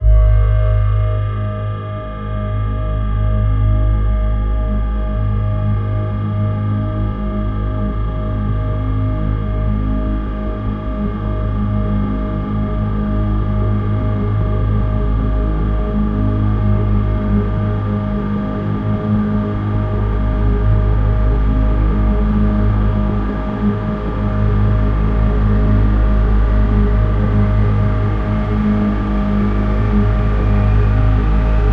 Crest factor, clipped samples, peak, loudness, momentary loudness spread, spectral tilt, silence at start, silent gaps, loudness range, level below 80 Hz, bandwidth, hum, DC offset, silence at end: 12 dB; under 0.1%; -2 dBFS; -17 LUFS; 5 LU; -10.5 dB/octave; 0 s; none; 4 LU; -18 dBFS; 3.9 kHz; none; under 0.1%; 0 s